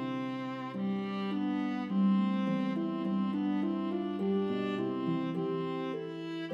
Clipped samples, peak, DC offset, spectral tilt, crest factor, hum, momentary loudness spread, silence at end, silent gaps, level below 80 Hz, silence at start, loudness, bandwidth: under 0.1%; -20 dBFS; under 0.1%; -8.5 dB/octave; 12 dB; none; 7 LU; 0 s; none; -82 dBFS; 0 s; -33 LUFS; 6.4 kHz